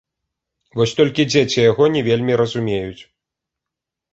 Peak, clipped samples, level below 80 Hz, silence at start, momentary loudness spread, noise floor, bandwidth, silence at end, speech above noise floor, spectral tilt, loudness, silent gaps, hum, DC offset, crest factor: 0 dBFS; under 0.1%; -52 dBFS; 0.75 s; 10 LU; -84 dBFS; 8 kHz; 1.1 s; 68 dB; -5.5 dB/octave; -17 LUFS; none; none; under 0.1%; 18 dB